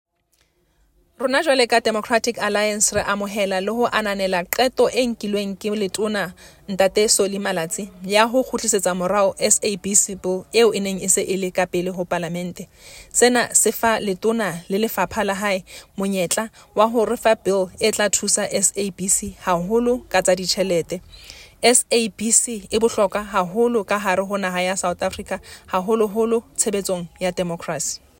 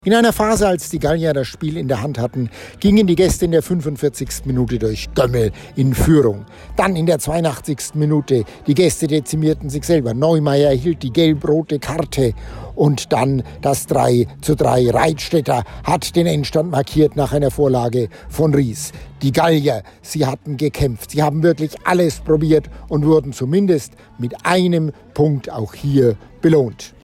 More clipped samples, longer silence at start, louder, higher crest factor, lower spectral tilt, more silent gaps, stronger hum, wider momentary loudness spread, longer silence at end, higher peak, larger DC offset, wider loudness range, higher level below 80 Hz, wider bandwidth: neither; first, 1.2 s vs 0.05 s; second, -20 LUFS vs -17 LUFS; first, 20 dB vs 12 dB; second, -2.5 dB/octave vs -6 dB/octave; neither; neither; about the same, 10 LU vs 8 LU; about the same, 0.2 s vs 0.15 s; first, 0 dBFS vs -4 dBFS; neither; about the same, 3 LU vs 1 LU; second, -52 dBFS vs -36 dBFS; about the same, 16.5 kHz vs 16.5 kHz